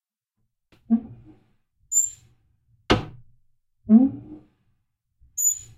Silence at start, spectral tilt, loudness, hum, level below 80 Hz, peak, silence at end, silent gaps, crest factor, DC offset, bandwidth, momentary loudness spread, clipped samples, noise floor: 0.9 s; -3.5 dB/octave; -22 LUFS; none; -48 dBFS; -4 dBFS; 0.2 s; none; 22 dB; under 0.1%; 15.5 kHz; 21 LU; under 0.1%; -76 dBFS